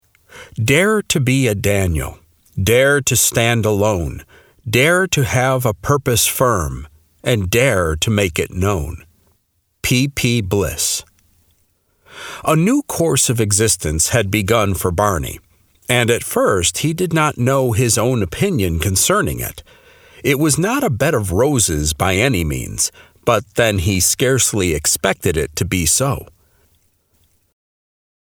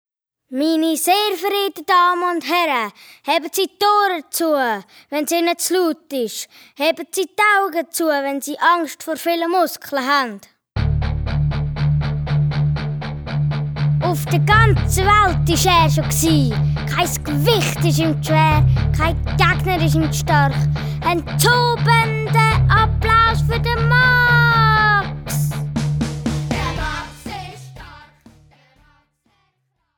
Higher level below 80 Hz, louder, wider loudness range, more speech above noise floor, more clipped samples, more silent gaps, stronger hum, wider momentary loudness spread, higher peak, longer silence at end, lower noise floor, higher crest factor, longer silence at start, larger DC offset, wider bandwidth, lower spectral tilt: second, -36 dBFS vs -30 dBFS; about the same, -16 LUFS vs -17 LUFS; about the same, 4 LU vs 6 LU; second, 49 dB vs 53 dB; neither; neither; neither; about the same, 10 LU vs 10 LU; about the same, 0 dBFS vs 0 dBFS; about the same, 2.05 s vs 2 s; second, -65 dBFS vs -69 dBFS; about the same, 18 dB vs 16 dB; second, 0.35 s vs 0.5 s; neither; about the same, over 20 kHz vs over 20 kHz; about the same, -4 dB/octave vs -5 dB/octave